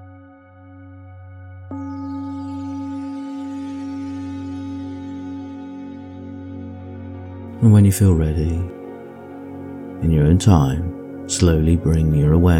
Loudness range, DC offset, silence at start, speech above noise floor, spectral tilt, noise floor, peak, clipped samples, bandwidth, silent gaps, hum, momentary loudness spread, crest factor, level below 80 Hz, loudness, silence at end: 13 LU; under 0.1%; 0 s; 30 dB; -7 dB/octave; -44 dBFS; -2 dBFS; under 0.1%; 15.5 kHz; none; none; 21 LU; 18 dB; -32 dBFS; -19 LUFS; 0 s